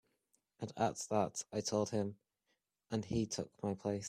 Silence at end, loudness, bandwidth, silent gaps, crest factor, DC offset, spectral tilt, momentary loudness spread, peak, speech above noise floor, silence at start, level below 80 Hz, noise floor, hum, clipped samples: 0 s; -39 LUFS; 15 kHz; none; 20 dB; under 0.1%; -5 dB/octave; 7 LU; -20 dBFS; 46 dB; 0.6 s; -68 dBFS; -84 dBFS; none; under 0.1%